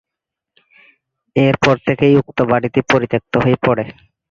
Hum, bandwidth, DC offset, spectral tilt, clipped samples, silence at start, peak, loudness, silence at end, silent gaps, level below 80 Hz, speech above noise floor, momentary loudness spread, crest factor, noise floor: none; 7.6 kHz; under 0.1%; -7 dB/octave; under 0.1%; 1.35 s; 0 dBFS; -15 LUFS; 0.4 s; none; -46 dBFS; 68 dB; 6 LU; 16 dB; -83 dBFS